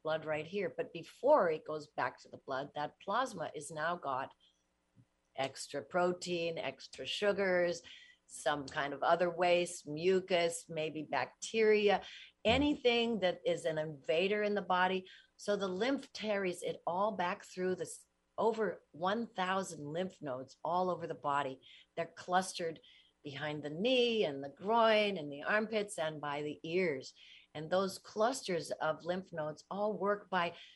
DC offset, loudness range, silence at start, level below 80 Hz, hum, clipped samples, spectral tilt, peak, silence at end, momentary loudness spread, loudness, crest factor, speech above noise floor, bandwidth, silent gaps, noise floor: under 0.1%; 6 LU; 0.05 s; -70 dBFS; none; under 0.1%; -4.5 dB/octave; -16 dBFS; 0.05 s; 12 LU; -35 LUFS; 20 dB; 41 dB; 11.5 kHz; none; -76 dBFS